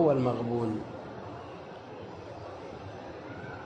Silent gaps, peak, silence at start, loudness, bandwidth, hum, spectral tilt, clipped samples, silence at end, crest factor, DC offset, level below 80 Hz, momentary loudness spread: none; -14 dBFS; 0 s; -36 LUFS; 9 kHz; none; -8.5 dB/octave; under 0.1%; 0 s; 20 dB; under 0.1%; -62 dBFS; 15 LU